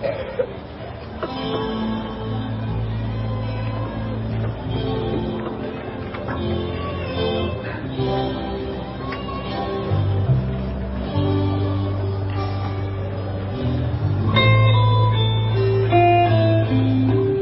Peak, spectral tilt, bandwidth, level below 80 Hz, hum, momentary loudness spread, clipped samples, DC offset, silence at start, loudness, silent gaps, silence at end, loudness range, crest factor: -4 dBFS; -12 dB/octave; 5.8 kHz; -34 dBFS; none; 12 LU; under 0.1%; under 0.1%; 0 s; -22 LUFS; none; 0 s; 9 LU; 16 dB